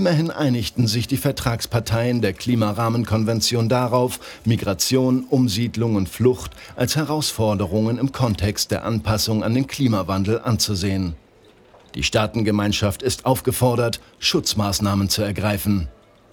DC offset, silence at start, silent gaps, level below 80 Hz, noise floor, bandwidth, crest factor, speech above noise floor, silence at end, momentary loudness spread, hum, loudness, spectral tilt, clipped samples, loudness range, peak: under 0.1%; 0 s; none; -42 dBFS; -51 dBFS; 19.5 kHz; 18 dB; 31 dB; 0.4 s; 4 LU; none; -21 LUFS; -5 dB/octave; under 0.1%; 2 LU; -2 dBFS